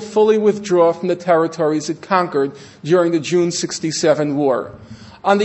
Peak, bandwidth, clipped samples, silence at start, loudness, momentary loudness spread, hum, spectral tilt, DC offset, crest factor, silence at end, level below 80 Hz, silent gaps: 0 dBFS; 8.4 kHz; under 0.1%; 0 s; -17 LUFS; 8 LU; none; -5 dB/octave; under 0.1%; 16 dB; 0 s; -60 dBFS; none